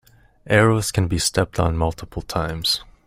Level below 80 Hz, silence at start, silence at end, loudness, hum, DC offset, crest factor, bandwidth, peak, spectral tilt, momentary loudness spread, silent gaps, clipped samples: -38 dBFS; 0.45 s; 0.2 s; -20 LUFS; none; under 0.1%; 20 dB; 16 kHz; -2 dBFS; -4.5 dB/octave; 9 LU; none; under 0.1%